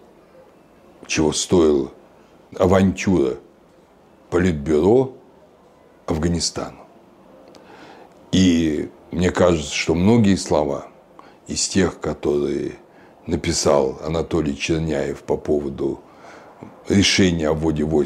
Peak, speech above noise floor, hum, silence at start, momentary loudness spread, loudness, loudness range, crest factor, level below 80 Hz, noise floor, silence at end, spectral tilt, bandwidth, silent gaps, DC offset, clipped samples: -4 dBFS; 33 dB; none; 1.1 s; 12 LU; -20 LUFS; 4 LU; 18 dB; -42 dBFS; -51 dBFS; 0 s; -5 dB/octave; 13 kHz; none; under 0.1%; under 0.1%